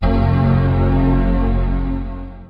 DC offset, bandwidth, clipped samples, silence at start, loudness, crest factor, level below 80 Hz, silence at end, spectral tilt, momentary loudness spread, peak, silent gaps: under 0.1%; 5 kHz; under 0.1%; 0 s; -17 LUFS; 12 dB; -20 dBFS; 0.05 s; -10.5 dB/octave; 9 LU; -4 dBFS; none